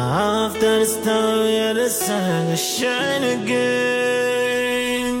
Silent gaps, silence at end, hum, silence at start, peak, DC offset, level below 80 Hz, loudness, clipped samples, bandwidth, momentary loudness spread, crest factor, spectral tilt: none; 0 s; none; 0 s; -8 dBFS; under 0.1%; -52 dBFS; -19 LUFS; under 0.1%; 16.5 kHz; 2 LU; 12 dB; -3.5 dB/octave